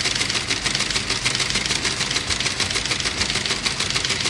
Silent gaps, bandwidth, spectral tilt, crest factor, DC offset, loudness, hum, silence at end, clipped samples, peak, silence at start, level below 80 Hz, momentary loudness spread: none; 12 kHz; -1 dB/octave; 18 dB; under 0.1%; -20 LUFS; none; 0 s; under 0.1%; -4 dBFS; 0 s; -40 dBFS; 1 LU